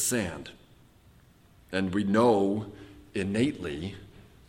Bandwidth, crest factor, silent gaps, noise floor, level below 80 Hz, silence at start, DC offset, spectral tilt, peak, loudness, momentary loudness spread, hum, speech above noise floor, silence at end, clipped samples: 17 kHz; 18 dB; none; -58 dBFS; -58 dBFS; 0 s; under 0.1%; -5 dB/octave; -12 dBFS; -28 LUFS; 20 LU; none; 30 dB; 0.25 s; under 0.1%